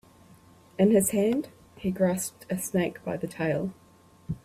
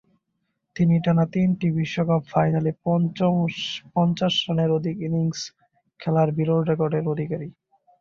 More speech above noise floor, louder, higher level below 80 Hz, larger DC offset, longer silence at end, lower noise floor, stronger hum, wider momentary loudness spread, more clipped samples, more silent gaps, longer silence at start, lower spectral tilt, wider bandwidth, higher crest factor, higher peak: second, 29 dB vs 54 dB; second, -27 LUFS vs -23 LUFS; about the same, -60 dBFS vs -58 dBFS; neither; second, 0.05 s vs 0.5 s; second, -55 dBFS vs -76 dBFS; neither; first, 14 LU vs 9 LU; neither; neither; about the same, 0.8 s vs 0.75 s; second, -5.5 dB/octave vs -7 dB/octave; first, 16 kHz vs 7.2 kHz; about the same, 18 dB vs 16 dB; second, -10 dBFS vs -6 dBFS